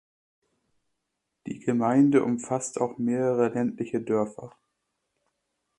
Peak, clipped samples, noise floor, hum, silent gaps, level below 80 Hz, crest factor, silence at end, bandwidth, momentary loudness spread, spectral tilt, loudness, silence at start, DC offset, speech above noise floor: -10 dBFS; under 0.1%; -81 dBFS; none; none; -70 dBFS; 18 dB; 1.3 s; 11 kHz; 12 LU; -7 dB/octave; -26 LUFS; 1.45 s; under 0.1%; 56 dB